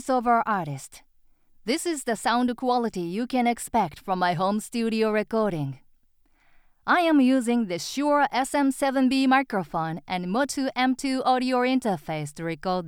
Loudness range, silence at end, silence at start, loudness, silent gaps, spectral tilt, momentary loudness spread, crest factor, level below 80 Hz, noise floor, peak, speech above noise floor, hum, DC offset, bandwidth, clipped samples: 4 LU; 0 s; 0 s; -25 LUFS; none; -5 dB/octave; 9 LU; 18 dB; -58 dBFS; -62 dBFS; -8 dBFS; 38 dB; none; under 0.1%; 16.5 kHz; under 0.1%